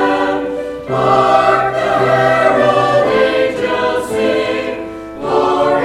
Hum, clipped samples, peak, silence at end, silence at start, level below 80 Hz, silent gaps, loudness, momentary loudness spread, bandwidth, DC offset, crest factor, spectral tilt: none; under 0.1%; 0 dBFS; 0 s; 0 s; -44 dBFS; none; -13 LUFS; 10 LU; 13.5 kHz; under 0.1%; 14 dB; -5.5 dB/octave